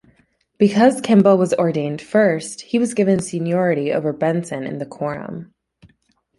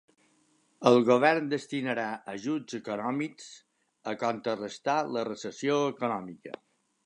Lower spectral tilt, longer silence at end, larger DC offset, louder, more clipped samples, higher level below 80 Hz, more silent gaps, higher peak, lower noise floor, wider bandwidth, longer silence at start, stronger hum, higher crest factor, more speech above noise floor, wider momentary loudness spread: about the same, -6.5 dB/octave vs -5.5 dB/octave; first, 0.95 s vs 0.55 s; neither; first, -18 LUFS vs -29 LUFS; neither; first, -60 dBFS vs -80 dBFS; neither; first, -2 dBFS vs -6 dBFS; second, -62 dBFS vs -68 dBFS; about the same, 11.5 kHz vs 11 kHz; second, 0.6 s vs 0.8 s; neither; second, 16 dB vs 22 dB; first, 45 dB vs 39 dB; second, 13 LU vs 19 LU